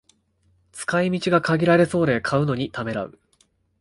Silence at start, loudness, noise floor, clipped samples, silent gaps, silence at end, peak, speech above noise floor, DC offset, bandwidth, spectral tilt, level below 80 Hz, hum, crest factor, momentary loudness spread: 0.75 s; -21 LUFS; -64 dBFS; under 0.1%; none; 0.7 s; -4 dBFS; 43 dB; under 0.1%; 11.5 kHz; -6.5 dB/octave; -54 dBFS; none; 18 dB; 13 LU